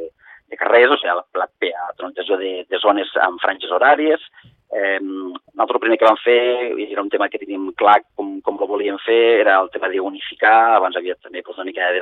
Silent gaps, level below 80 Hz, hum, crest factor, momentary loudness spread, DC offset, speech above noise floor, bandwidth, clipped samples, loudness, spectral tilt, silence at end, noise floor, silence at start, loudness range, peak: none; -68 dBFS; none; 18 dB; 15 LU; under 0.1%; 21 dB; 4.3 kHz; under 0.1%; -17 LUFS; -5 dB/octave; 0 s; -38 dBFS; 0 s; 2 LU; 0 dBFS